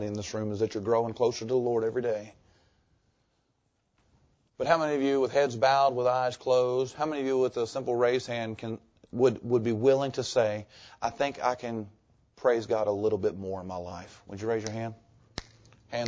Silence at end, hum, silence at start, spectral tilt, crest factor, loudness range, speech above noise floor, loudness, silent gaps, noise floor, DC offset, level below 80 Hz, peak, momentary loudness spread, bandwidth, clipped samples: 0 s; none; 0 s; -5.5 dB/octave; 20 dB; 6 LU; 47 dB; -29 LUFS; none; -75 dBFS; under 0.1%; -62 dBFS; -8 dBFS; 14 LU; 8 kHz; under 0.1%